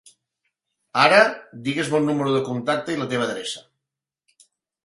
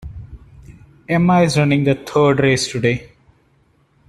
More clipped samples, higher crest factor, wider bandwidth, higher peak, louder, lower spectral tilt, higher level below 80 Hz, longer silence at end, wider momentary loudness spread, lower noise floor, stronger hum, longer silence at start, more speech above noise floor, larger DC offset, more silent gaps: neither; first, 22 dB vs 16 dB; about the same, 11.5 kHz vs 12.5 kHz; about the same, -2 dBFS vs -2 dBFS; second, -21 LUFS vs -16 LUFS; second, -4.5 dB/octave vs -6 dB/octave; second, -66 dBFS vs -44 dBFS; first, 1.25 s vs 1.05 s; first, 15 LU vs 11 LU; first, -86 dBFS vs -57 dBFS; neither; first, 0.95 s vs 0 s; first, 65 dB vs 42 dB; neither; neither